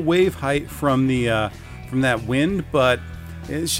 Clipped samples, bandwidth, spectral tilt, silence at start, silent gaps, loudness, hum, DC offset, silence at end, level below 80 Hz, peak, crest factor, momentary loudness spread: under 0.1%; 16 kHz; -5 dB/octave; 0 s; none; -21 LUFS; none; under 0.1%; 0 s; -42 dBFS; -6 dBFS; 16 dB; 11 LU